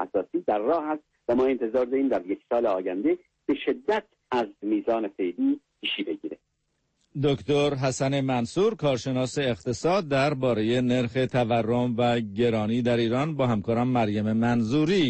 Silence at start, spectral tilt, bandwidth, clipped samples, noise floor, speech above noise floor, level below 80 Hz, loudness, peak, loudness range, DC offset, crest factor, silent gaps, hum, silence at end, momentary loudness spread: 0 s; -6.5 dB/octave; 8.8 kHz; under 0.1%; -75 dBFS; 50 dB; -56 dBFS; -26 LUFS; -12 dBFS; 4 LU; under 0.1%; 12 dB; none; none; 0 s; 6 LU